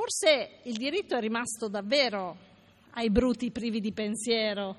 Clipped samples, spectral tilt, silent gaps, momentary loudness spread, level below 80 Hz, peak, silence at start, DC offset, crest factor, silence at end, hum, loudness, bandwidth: under 0.1%; -3.5 dB/octave; none; 9 LU; -52 dBFS; -10 dBFS; 0 s; under 0.1%; 20 dB; 0 s; none; -29 LUFS; 12.5 kHz